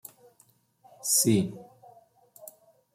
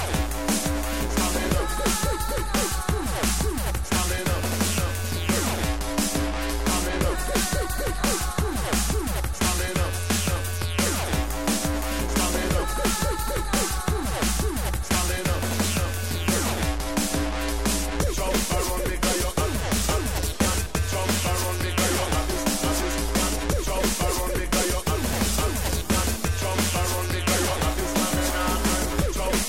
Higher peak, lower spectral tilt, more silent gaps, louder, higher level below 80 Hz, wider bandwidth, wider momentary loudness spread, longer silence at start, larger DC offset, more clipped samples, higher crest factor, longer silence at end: second, -12 dBFS vs -8 dBFS; about the same, -4 dB/octave vs -3.5 dB/octave; neither; about the same, -25 LUFS vs -25 LUFS; second, -70 dBFS vs -30 dBFS; about the same, 16.5 kHz vs 16.5 kHz; first, 27 LU vs 3 LU; first, 1.05 s vs 0 s; second, under 0.1% vs 1%; neither; about the same, 20 dB vs 18 dB; first, 1.3 s vs 0 s